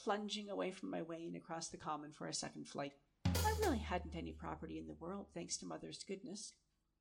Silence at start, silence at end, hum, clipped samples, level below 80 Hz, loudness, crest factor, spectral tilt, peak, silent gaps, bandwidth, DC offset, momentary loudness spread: 0 s; 0.5 s; none; under 0.1%; -56 dBFS; -44 LUFS; 20 dB; -4.5 dB/octave; -24 dBFS; none; 16 kHz; under 0.1%; 11 LU